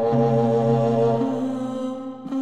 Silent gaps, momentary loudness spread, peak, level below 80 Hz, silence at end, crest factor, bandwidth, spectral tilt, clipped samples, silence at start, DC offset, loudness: none; 10 LU; -8 dBFS; -58 dBFS; 0 s; 12 dB; 9 kHz; -9 dB/octave; under 0.1%; 0 s; 0.4%; -22 LUFS